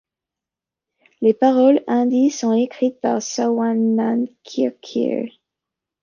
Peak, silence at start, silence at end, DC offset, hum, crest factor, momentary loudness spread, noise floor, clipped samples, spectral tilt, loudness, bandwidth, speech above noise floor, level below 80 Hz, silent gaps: -4 dBFS; 1.2 s; 0.75 s; under 0.1%; none; 16 dB; 8 LU; -87 dBFS; under 0.1%; -5.5 dB/octave; -19 LUFS; 7.2 kHz; 69 dB; -72 dBFS; none